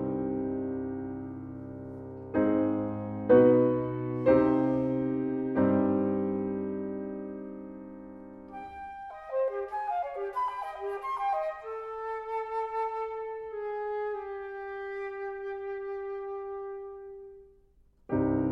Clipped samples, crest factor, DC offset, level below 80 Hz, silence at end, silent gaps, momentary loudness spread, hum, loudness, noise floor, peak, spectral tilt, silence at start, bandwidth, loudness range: under 0.1%; 22 dB; under 0.1%; -58 dBFS; 0 s; none; 17 LU; none; -30 LUFS; -62 dBFS; -10 dBFS; -10 dB/octave; 0 s; 5.4 kHz; 12 LU